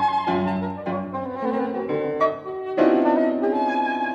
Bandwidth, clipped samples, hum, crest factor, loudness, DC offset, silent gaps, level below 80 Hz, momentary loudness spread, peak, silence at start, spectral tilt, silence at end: 7.2 kHz; under 0.1%; none; 16 dB; -23 LUFS; under 0.1%; none; -62 dBFS; 9 LU; -6 dBFS; 0 s; -8 dB/octave; 0 s